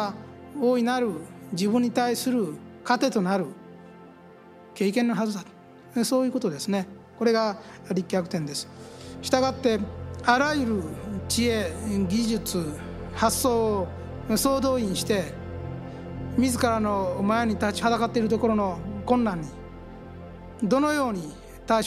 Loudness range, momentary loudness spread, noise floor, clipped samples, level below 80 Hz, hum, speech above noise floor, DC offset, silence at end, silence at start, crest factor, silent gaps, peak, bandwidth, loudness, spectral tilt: 3 LU; 16 LU; -49 dBFS; under 0.1%; -48 dBFS; none; 24 dB; under 0.1%; 0 s; 0 s; 22 dB; none; -4 dBFS; 15.5 kHz; -26 LUFS; -5 dB/octave